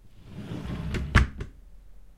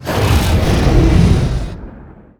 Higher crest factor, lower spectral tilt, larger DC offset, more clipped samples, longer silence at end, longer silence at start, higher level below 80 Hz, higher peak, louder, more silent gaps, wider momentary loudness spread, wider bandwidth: first, 24 dB vs 14 dB; about the same, -6 dB/octave vs -6.5 dB/octave; neither; neither; second, 0 s vs 0.35 s; about the same, 0.05 s vs 0 s; second, -32 dBFS vs -18 dBFS; second, -4 dBFS vs 0 dBFS; second, -28 LUFS vs -13 LUFS; neither; first, 19 LU vs 14 LU; second, 12 kHz vs over 20 kHz